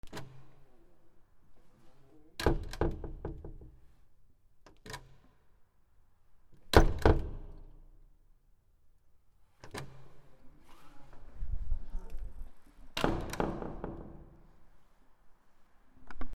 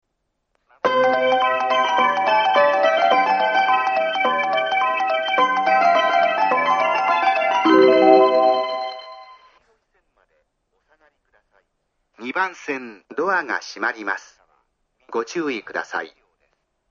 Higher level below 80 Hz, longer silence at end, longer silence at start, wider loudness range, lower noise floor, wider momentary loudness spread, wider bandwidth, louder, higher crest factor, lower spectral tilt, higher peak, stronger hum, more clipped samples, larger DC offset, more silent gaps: first, -40 dBFS vs -74 dBFS; second, 0 s vs 0.85 s; second, 0.05 s vs 0.85 s; first, 21 LU vs 13 LU; second, -65 dBFS vs -74 dBFS; first, 27 LU vs 15 LU; first, 15.5 kHz vs 7.2 kHz; second, -34 LUFS vs -18 LUFS; first, 30 dB vs 20 dB; first, -6 dB/octave vs -3.5 dB/octave; second, -6 dBFS vs 0 dBFS; neither; neither; neither; neither